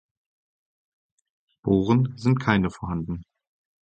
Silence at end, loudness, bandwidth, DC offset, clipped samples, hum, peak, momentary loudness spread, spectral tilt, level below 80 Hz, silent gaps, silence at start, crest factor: 0.65 s; -24 LUFS; 8.8 kHz; under 0.1%; under 0.1%; none; -4 dBFS; 12 LU; -8 dB/octave; -48 dBFS; none; 1.65 s; 24 dB